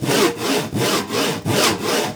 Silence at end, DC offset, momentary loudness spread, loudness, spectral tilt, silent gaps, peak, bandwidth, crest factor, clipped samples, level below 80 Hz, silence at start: 0 s; under 0.1%; 4 LU; -19 LUFS; -3.5 dB/octave; none; -2 dBFS; over 20 kHz; 18 dB; under 0.1%; -52 dBFS; 0 s